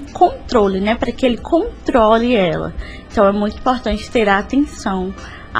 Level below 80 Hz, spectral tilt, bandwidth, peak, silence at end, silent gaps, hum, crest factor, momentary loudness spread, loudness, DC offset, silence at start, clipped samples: -34 dBFS; -6 dB/octave; 10.5 kHz; 0 dBFS; 0 s; none; none; 16 dB; 10 LU; -16 LUFS; under 0.1%; 0 s; under 0.1%